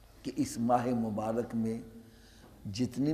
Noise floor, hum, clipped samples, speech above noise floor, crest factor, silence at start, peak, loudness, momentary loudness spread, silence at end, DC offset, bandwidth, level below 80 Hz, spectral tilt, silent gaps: -56 dBFS; none; under 0.1%; 24 dB; 18 dB; 0.15 s; -16 dBFS; -33 LUFS; 16 LU; 0 s; under 0.1%; 14.5 kHz; -60 dBFS; -6.5 dB/octave; none